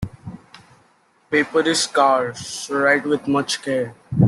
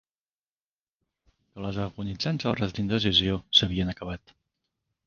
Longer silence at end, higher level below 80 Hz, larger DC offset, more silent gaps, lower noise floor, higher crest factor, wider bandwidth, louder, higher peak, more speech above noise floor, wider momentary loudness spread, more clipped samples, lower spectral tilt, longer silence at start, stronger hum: second, 0 s vs 0.9 s; about the same, -50 dBFS vs -48 dBFS; neither; neither; second, -58 dBFS vs under -90 dBFS; second, 18 dB vs 26 dB; first, 12.5 kHz vs 7.2 kHz; first, -20 LUFS vs -26 LUFS; about the same, -2 dBFS vs -4 dBFS; second, 39 dB vs over 63 dB; second, 12 LU vs 15 LU; neither; about the same, -4.5 dB/octave vs -5.5 dB/octave; second, 0 s vs 1.55 s; neither